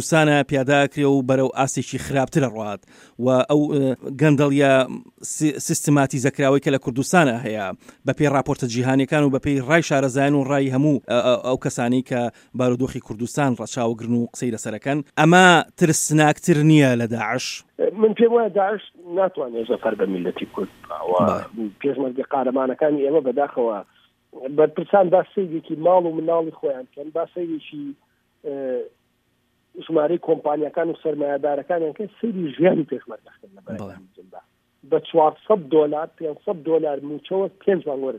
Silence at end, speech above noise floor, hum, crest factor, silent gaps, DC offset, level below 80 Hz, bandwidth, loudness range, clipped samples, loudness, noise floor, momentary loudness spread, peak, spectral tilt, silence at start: 0 s; 47 dB; none; 20 dB; none; under 0.1%; -58 dBFS; 16 kHz; 7 LU; under 0.1%; -20 LUFS; -67 dBFS; 13 LU; 0 dBFS; -5.5 dB/octave; 0 s